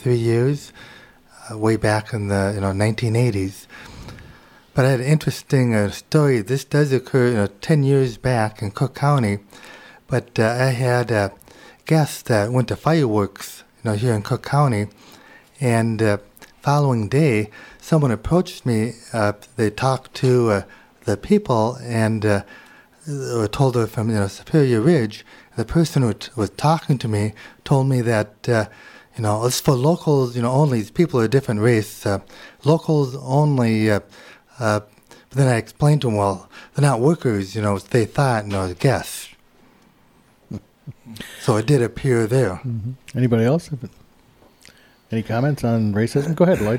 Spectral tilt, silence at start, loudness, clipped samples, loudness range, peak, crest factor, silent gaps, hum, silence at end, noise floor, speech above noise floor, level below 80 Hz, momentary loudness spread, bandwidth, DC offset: -6.5 dB/octave; 0 s; -20 LUFS; under 0.1%; 3 LU; -2 dBFS; 16 dB; none; none; 0 s; -55 dBFS; 36 dB; -48 dBFS; 12 LU; 16.5 kHz; under 0.1%